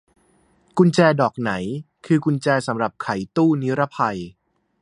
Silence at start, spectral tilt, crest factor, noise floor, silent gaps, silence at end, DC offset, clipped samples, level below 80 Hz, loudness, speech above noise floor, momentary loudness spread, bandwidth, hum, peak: 0.75 s; -7 dB/octave; 20 dB; -60 dBFS; none; 0.5 s; under 0.1%; under 0.1%; -58 dBFS; -20 LUFS; 40 dB; 13 LU; 10.5 kHz; none; -2 dBFS